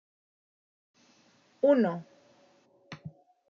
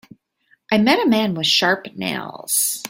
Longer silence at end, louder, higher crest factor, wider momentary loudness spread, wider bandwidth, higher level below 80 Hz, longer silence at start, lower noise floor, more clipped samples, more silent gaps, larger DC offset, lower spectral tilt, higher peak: first, 0.4 s vs 0 s; second, -27 LUFS vs -18 LUFS; about the same, 22 dB vs 18 dB; first, 25 LU vs 10 LU; second, 6.8 kHz vs 16.5 kHz; second, -82 dBFS vs -62 dBFS; first, 1.65 s vs 0.7 s; first, -65 dBFS vs -61 dBFS; neither; neither; neither; first, -6.5 dB/octave vs -2.5 dB/octave; second, -12 dBFS vs -2 dBFS